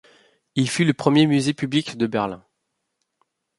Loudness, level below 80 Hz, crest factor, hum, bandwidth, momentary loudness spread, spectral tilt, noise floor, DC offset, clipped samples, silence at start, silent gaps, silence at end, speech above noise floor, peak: -21 LUFS; -62 dBFS; 20 dB; none; 11.5 kHz; 12 LU; -5.5 dB/octave; -77 dBFS; under 0.1%; under 0.1%; 0.55 s; none; 1.2 s; 57 dB; -2 dBFS